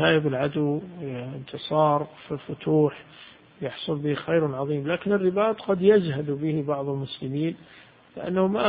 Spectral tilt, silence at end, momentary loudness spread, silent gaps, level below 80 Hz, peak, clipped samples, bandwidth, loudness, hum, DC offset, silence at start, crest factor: -11.5 dB/octave; 0 s; 13 LU; none; -60 dBFS; -6 dBFS; under 0.1%; 5 kHz; -25 LUFS; none; under 0.1%; 0 s; 20 dB